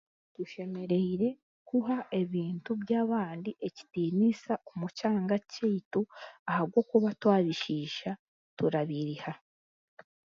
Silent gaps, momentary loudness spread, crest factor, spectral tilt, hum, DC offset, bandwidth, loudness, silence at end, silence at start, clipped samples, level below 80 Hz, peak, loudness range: 1.42-1.66 s, 5.85-5.91 s, 6.39-6.46 s, 8.19-8.57 s; 13 LU; 20 dB; -7.5 dB/octave; none; under 0.1%; 7.4 kHz; -32 LUFS; 0.9 s; 0.4 s; under 0.1%; -74 dBFS; -10 dBFS; 2 LU